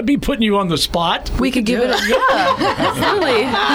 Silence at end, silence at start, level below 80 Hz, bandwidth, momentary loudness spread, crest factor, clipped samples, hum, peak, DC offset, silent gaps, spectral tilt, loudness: 0 s; 0 s; -32 dBFS; over 20 kHz; 3 LU; 12 dB; under 0.1%; none; -4 dBFS; under 0.1%; none; -4.5 dB/octave; -16 LUFS